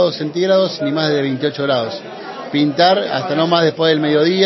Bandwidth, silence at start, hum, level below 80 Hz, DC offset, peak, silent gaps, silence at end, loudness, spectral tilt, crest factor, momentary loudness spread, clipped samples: 6.2 kHz; 0 s; none; -66 dBFS; under 0.1%; 0 dBFS; none; 0 s; -16 LUFS; -6 dB/octave; 16 dB; 8 LU; under 0.1%